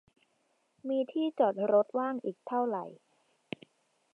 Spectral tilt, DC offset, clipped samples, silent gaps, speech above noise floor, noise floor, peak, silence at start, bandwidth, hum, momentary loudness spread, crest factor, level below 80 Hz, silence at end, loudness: -8 dB/octave; under 0.1%; under 0.1%; none; 44 dB; -75 dBFS; -14 dBFS; 0.85 s; 4.4 kHz; none; 18 LU; 18 dB; -86 dBFS; 1.2 s; -31 LUFS